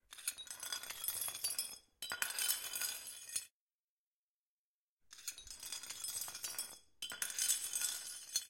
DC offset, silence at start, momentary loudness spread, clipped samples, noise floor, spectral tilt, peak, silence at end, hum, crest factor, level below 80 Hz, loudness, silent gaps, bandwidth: under 0.1%; 0.1 s; 13 LU; under 0.1%; under -90 dBFS; 2.5 dB/octave; -18 dBFS; 0 s; none; 28 dB; -78 dBFS; -40 LUFS; 3.51-4.98 s; 17 kHz